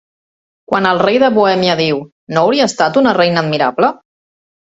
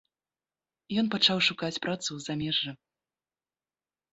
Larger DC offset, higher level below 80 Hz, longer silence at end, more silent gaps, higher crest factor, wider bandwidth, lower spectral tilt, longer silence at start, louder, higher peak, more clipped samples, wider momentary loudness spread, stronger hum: neither; first, -56 dBFS vs -68 dBFS; second, 0.75 s vs 1.4 s; first, 2.12-2.27 s vs none; second, 14 dB vs 24 dB; about the same, 8 kHz vs 8 kHz; first, -5 dB/octave vs -3.5 dB/octave; second, 0.7 s vs 0.9 s; first, -13 LUFS vs -28 LUFS; first, 0 dBFS vs -10 dBFS; neither; second, 6 LU vs 10 LU; neither